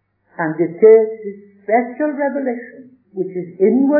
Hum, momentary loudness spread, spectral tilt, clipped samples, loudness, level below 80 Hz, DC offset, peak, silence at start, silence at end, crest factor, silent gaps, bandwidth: none; 21 LU; -13.5 dB/octave; under 0.1%; -16 LUFS; -80 dBFS; under 0.1%; 0 dBFS; 0.4 s; 0 s; 16 dB; none; 2.6 kHz